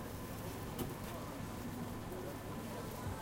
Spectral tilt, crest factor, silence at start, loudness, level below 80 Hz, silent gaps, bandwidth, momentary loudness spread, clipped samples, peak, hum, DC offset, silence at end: -5.5 dB/octave; 16 dB; 0 s; -45 LUFS; -56 dBFS; none; 17 kHz; 2 LU; under 0.1%; -28 dBFS; none; under 0.1%; 0 s